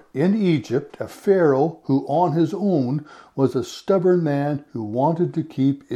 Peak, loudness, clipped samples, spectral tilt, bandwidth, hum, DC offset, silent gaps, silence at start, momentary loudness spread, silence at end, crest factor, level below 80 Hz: -4 dBFS; -21 LUFS; under 0.1%; -8 dB/octave; 13 kHz; none; under 0.1%; none; 0.15 s; 9 LU; 0 s; 16 dB; -66 dBFS